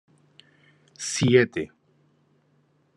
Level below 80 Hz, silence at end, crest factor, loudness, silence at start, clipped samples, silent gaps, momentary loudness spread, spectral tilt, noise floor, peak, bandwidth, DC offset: -66 dBFS; 1.3 s; 24 dB; -23 LUFS; 1 s; under 0.1%; none; 15 LU; -5 dB/octave; -65 dBFS; -4 dBFS; 11 kHz; under 0.1%